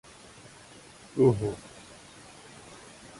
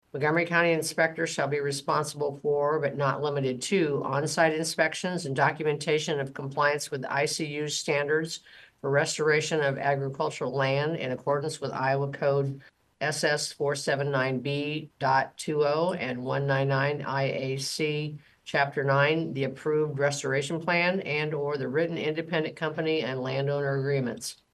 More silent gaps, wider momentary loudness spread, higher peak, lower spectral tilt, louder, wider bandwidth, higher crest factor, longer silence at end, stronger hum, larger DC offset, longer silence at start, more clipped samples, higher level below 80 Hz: neither; first, 25 LU vs 6 LU; about the same, -10 dBFS vs -8 dBFS; first, -7 dB/octave vs -4.5 dB/octave; about the same, -27 LUFS vs -28 LUFS; about the same, 11.5 kHz vs 12.5 kHz; about the same, 22 dB vs 20 dB; first, 0.45 s vs 0.2 s; neither; neither; first, 1.15 s vs 0.15 s; neither; first, -58 dBFS vs -70 dBFS